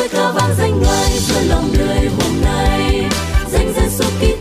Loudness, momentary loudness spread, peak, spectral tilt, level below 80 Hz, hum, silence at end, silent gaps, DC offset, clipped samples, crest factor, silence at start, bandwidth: -15 LUFS; 3 LU; -4 dBFS; -5 dB/octave; -20 dBFS; none; 0 s; none; under 0.1%; under 0.1%; 10 dB; 0 s; 15.5 kHz